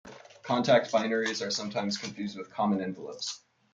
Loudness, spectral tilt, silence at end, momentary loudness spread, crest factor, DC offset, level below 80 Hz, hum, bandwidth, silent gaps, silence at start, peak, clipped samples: -30 LUFS; -4 dB/octave; 0.35 s; 13 LU; 20 dB; under 0.1%; -74 dBFS; none; 9.2 kHz; none; 0.05 s; -10 dBFS; under 0.1%